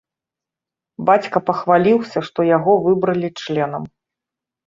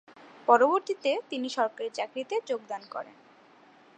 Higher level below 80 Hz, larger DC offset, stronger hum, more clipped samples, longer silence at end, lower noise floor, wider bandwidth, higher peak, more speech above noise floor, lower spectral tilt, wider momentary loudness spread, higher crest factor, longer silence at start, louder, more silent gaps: first, -62 dBFS vs -90 dBFS; neither; neither; neither; about the same, 0.8 s vs 0.85 s; first, -87 dBFS vs -57 dBFS; second, 7.6 kHz vs 9.2 kHz; first, -2 dBFS vs -6 dBFS; first, 70 dB vs 29 dB; first, -7.5 dB/octave vs -3 dB/octave; second, 9 LU vs 16 LU; about the same, 18 dB vs 22 dB; first, 1 s vs 0.45 s; first, -17 LUFS vs -28 LUFS; neither